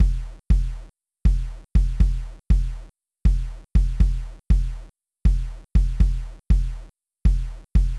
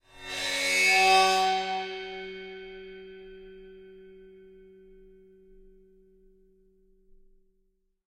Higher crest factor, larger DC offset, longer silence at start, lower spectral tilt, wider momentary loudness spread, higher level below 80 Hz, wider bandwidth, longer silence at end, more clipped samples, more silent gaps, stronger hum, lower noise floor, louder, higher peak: second, 16 dB vs 22 dB; neither; second, 0 s vs 0.15 s; first, -8 dB/octave vs -0.5 dB/octave; second, 10 LU vs 28 LU; first, -22 dBFS vs -60 dBFS; second, 6 kHz vs 16 kHz; second, 0 s vs 3.85 s; neither; neither; neither; second, -41 dBFS vs -72 dBFS; about the same, -25 LUFS vs -24 LUFS; first, -6 dBFS vs -10 dBFS